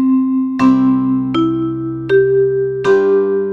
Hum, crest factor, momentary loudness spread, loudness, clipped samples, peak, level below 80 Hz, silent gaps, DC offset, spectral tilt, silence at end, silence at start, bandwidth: none; 12 dB; 5 LU; -14 LUFS; under 0.1%; -2 dBFS; -48 dBFS; none; under 0.1%; -8 dB/octave; 0 s; 0 s; 7.2 kHz